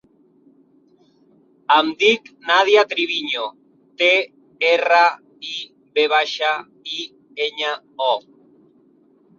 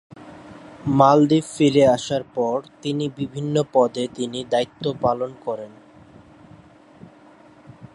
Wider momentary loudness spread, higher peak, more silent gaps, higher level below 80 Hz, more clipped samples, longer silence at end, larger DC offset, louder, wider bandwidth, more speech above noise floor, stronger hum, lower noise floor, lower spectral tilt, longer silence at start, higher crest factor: about the same, 15 LU vs 16 LU; about the same, -2 dBFS vs -2 dBFS; neither; second, -74 dBFS vs -58 dBFS; neither; first, 1.2 s vs 0.1 s; neither; first, -18 LUFS vs -21 LUFS; second, 7.4 kHz vs 11.5 kHz; first, 38 dB vs 29 dB; neither; first, -56 dBFS vs -49 dBFS; second, -1.5 dB/octave vs -6.5 dB/octave; first, 1.7 s vs 0.15 s; about the same, 20 dB vs 20 dB